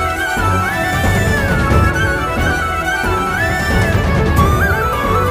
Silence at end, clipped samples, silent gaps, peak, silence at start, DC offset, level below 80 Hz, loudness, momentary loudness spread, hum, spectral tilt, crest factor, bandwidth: 0 s; under 0.1%; none; 0 dBFS; 0 s; under 0.1%; -22 dBFS; -15 LUFS; 3 LU; none; -5.5 dB/octave; 14 dB; 15.5 kHz